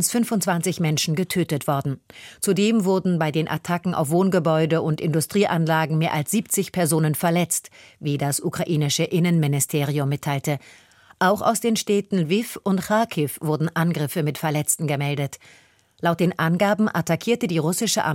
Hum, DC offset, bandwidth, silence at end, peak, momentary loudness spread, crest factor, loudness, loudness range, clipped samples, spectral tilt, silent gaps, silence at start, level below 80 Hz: none; under 0.1%; 17 kHz; 0 s; -6 dBFS; 5 LU; 16 dB; -22 LUFS; 2 LU; under 0.1%; -5 dB/octave; none; 0 s; -62 dBFS